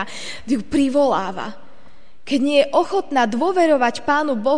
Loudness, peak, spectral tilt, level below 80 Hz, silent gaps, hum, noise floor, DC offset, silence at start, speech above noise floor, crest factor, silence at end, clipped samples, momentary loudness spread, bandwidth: -19 LUFS; -4 dBFS; -4.5 dB/octave; -52 dBFS; none; none; -52 dBFS; 2%; 0 s; 33 dB; 16 dB; 0 s; under 0.1%; 12 LU; 10 kHz